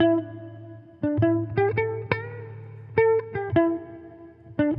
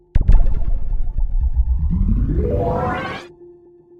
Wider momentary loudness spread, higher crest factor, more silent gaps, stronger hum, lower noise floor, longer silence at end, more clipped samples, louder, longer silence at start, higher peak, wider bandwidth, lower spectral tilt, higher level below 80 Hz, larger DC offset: first, 20 LU vs 9 LU; about the same, 20 dB vs 16 dB; neither; neither; about the same, -46 dBFS vs -46 dBFS; second, 0 s vs 0.5 s; neither; second, -25 LUFS vs -21 LUFS; second, 0 s vs 0.15 s; second, -4 dBFS vs 0 dBFS; first, 5.4 kHz vs 4.8 kHz; first, -10.5 dB/octave vs -9 dB/octave; second, -58 dBFS vs -18 dBFS; neither